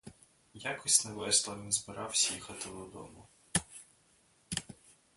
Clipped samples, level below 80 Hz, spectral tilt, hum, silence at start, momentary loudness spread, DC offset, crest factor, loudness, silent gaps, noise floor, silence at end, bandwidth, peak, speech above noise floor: under 0.1%; -64 dBFS; -1 dB/octave; none; 0.05 s; 22 LU; under 0.1%; 28 dB; -32 LUFS; none; -68 dBFS; 0.25 s; 12 kHz; -8 dBFS; 34 dB